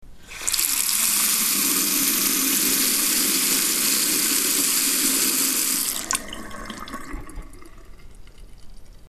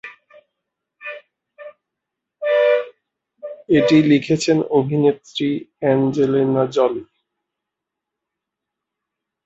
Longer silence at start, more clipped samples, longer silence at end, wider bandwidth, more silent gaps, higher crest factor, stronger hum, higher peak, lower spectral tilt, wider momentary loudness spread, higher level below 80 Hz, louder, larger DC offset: about the same, 0 s vs 0.05 s; neither; second, 0 s vs 2.4 s; first, 14.5 kHz vs 8 kHz; neither; about the same, 22 dB vs 18 dB; neither; about the same, 0 dBFS vs -2 dBFS; second, 0 dB/octave vs -6.5 dB/octave; second, 17 LU vs 21 LU; first, -44 dBFS vs -60 dBFS; about the same, -19 LUFS vs -18 LUFS; neither